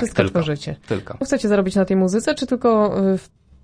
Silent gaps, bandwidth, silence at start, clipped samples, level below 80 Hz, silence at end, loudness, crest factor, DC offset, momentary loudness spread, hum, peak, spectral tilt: none; 10.5 kHz; 0 s; under 0.1%; -48 dBFS; 0.4 s; -20 LUFS; 18 dB; under 0.1%; 9 LU; none; 0 dBFS; -6 dB/octave